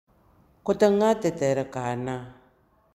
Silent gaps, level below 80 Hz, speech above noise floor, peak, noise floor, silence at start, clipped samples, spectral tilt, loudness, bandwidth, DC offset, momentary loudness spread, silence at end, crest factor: none; -60 dBFS; 38 dB; -8 dBFS; -62 dBFS; 0.65 s; under 0.1%; -6 dB/octave; -25 LUFS; 13.5 kHz; under 0.1%; 14 LU; 0.65 s; 18 dB